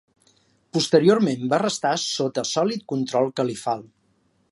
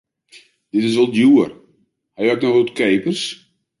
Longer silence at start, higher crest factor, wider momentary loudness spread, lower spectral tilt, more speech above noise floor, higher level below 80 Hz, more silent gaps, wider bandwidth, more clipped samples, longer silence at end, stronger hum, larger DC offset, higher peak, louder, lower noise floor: about the same, 0.75 s vs 0.75 s; first, 20 dB vs 14 dB; about the same, 10 LU vs 11 LU; about the same, -4.5 dB/octave vs -5.5 dB/octave; about the same, 44 dB vs 46 dB; second, -70 dBFS vs -64 dBFS; neither; about the same, 11.5 kHz vs 11.5 kHz; neither; first, 0.65 s vs 0.45 s; neither; neither; about the same, -4 dBFS vs -4 dBFS; second, -22 LUFS vs -17 LUFS; first, -65 dBFS vs -61 dBFS